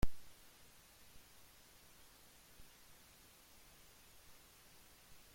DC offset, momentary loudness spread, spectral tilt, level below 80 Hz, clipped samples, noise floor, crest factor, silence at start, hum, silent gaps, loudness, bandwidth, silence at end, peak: under 0.1%; 0 LU; -4.5 dB/octave; -56 dBFS; under 0.1%; -64 dBFS; 24 dB; 0 s; none; none; -60 LUFS; 16.5 kHz; 0 s; -20 dBFS